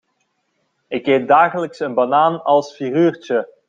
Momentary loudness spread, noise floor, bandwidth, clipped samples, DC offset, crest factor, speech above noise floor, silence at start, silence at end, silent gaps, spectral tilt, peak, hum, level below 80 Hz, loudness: 9 LU; -68 dBFS; 7.6 kHz; under 0.1%; under 0.1%; 16 dB; 52 dB; 0.9 s; 0.2 s; none; -6.5 dB/octave; -2 dBFS; none; -68 dBFS; -17 LUFS